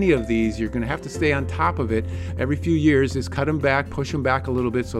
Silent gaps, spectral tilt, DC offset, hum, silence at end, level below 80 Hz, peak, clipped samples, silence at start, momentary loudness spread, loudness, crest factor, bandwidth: none; -7 dB/octave; under 0.1%; none; 0 s; -36 dBFS; -6 dBFS; under 0.1%; 0 s; 7 LU; -22 LUFS; 16 dB; 12.5 kHz